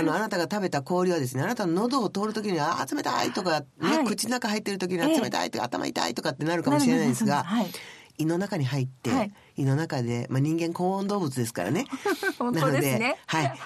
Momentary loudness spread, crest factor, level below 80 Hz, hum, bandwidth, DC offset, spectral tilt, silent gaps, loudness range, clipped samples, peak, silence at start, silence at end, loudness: 5 LU; 18 dB; -68 dBFS; none; 13.5 kHz; under 0.1%; -5 dB/octave; none; 2 LU; under 0.1%; -8 dBFS; 0 s; 0 s; -27 LUFS